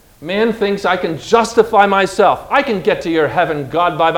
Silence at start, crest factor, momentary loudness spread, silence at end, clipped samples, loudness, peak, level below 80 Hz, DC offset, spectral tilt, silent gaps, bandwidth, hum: 0.2 s; 14 dB; 6 LU; 0 s; 0.1%; -14 LUFS; 0 dBFS; -46 dBFS; under 0.1%; -5 dB/octave; none; 16.5 kHz; none